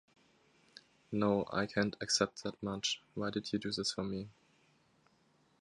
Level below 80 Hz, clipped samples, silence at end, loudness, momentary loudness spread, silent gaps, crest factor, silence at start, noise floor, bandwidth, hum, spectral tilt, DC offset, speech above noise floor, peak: -68 dBFS; under 0.1%; 1.3 s; -36 LUFS; 9 LU; none; 24 dB; 1.1 s; -72 dBFS; 11 kHz; none; -3.5 dB/octave; under 0.1%; 35 dB; -16 dBFS